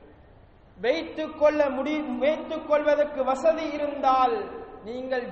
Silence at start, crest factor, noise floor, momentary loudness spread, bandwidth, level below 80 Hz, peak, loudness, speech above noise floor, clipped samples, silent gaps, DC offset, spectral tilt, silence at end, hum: 0.8 s; 16 dB; -53 dBFS; 11 LU; 8.2 kHz; -56 dBFS; -10 dBFS; -25 LUFS; 28 dB; under 0.1%; none; under 0.1%; -5 dB/octave; 0 s; none